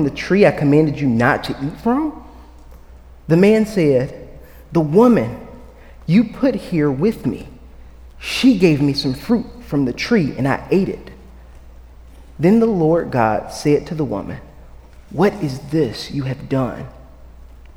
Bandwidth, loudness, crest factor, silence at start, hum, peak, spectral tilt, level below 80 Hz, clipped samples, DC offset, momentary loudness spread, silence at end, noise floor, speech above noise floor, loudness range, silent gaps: 17 kHz; -17 LUFS; 18 dB; 0 s; none; 0 dBFS; -7 dB/octave; -40 dBFS; under 0.1%; under 0.1%; 14 LU; 0.2 s; -41 dBFS; 24 dB; 4 LU; none